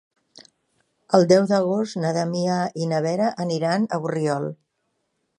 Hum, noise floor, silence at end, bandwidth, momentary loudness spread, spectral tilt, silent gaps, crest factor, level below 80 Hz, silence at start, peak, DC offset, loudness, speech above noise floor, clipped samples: none; -74 dBFS; 0.85 s; 10.5 kHz; 8 LU; -6 dB/octave; none; 22 dB; -70 dBFS; 0.35 s; -2 dBFS; under 0.1%; -22 LUFS; 53 dB; under 0.1%